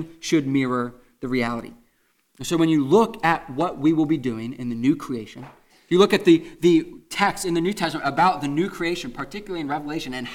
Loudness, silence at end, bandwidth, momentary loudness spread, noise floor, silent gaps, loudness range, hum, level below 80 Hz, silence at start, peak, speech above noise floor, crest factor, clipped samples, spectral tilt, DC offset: -22 LUFS; 0 s; 16 kHz; 14 LU; -66 dBFS; none; 3 LU; none; -52 dBFS; 0 s; -4 dBFS; 44 dB; 18 dB; under 0.1%; -5.5 dB/octave; under 0.1%